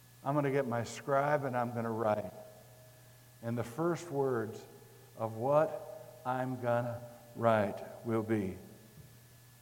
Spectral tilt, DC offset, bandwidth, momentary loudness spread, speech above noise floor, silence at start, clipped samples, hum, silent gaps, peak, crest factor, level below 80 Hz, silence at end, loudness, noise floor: -7 dB/octave; under 0.1%; 17 kHz; 19 LU; 25 dB; 0.25 s; under 0.1%; none; none; -14 dBFS; 22 dB; -74 dBFS; 0.25 s; -34 LUFS; -58 dBFS